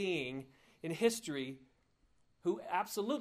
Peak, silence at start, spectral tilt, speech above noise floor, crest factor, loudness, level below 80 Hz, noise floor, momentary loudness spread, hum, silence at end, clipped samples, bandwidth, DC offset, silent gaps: -18 dBFS; 0 s; -4 dB/octave; 37 dB; 20 dB; -38 LUFS; -76 dBFS; -74 dBFS; 14 LU; none; 0 s; under 0.1%; 15.5 kHz; under 0.1%; none